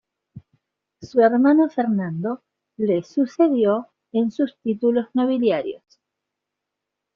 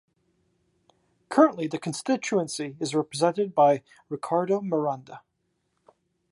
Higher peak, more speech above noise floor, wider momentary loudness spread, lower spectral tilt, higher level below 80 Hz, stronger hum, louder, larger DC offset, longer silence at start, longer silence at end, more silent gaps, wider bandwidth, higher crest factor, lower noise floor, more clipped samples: about the same, -4 dBFS vs -6 dBFS; first, 63 dB vs 50 dB; about the same, 11 LU vs 10 LU; about the same, -6.5 dB/octave vs -5.5 dB/octave; first, -66 dBFS vs -76 dBFS; neither; first, -21 LUFS vs -25 LUFS; neither; second, 0.35 s vs 1.3 s; first, 1.4 s vs 1.15 s; neither; second, 6.8 kHz vs 11.5 kHz; second, 16 dB vs 22 dB; first, -83 dBFS vs -75 dBFS; neither